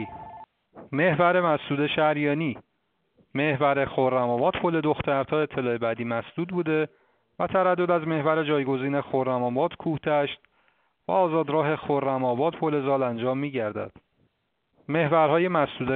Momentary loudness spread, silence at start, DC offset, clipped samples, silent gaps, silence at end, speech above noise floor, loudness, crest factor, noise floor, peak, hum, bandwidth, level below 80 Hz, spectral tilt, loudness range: 10 LU; 0 s; under 0.1%; under 0.1%; none; 0 s; 50 dB; -25 LUFS; 18 dB; -74 dBFS; -8 dBFS; none; 4.4 kHz; -60 dBFS; -5 dB/octave; 2 LU